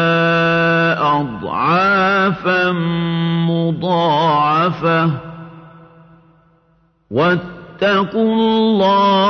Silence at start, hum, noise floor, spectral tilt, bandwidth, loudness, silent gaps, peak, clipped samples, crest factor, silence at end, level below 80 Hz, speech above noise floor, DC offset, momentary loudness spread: 0 s; none; -57 dBFS; -7.5 dB/octave; 6.4 kHz; -15 LUFS; none; -4 dBFS; under 0.1%; 12 dB; 0 s; -52 dBFS; 43 dB; under 0.1%; 7 LU